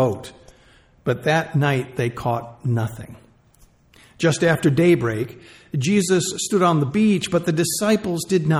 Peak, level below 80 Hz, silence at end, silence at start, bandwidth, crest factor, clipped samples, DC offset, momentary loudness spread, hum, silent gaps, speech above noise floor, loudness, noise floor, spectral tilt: -6 dBFS; -54 dBFS; 0 s; 0 s; 15 kHz; 16 dB; under 0.1%; under 0.1%; 12 LU; none; none; 34 dB; -20 LUFS; -54 dBFS; -5.5 dB/octave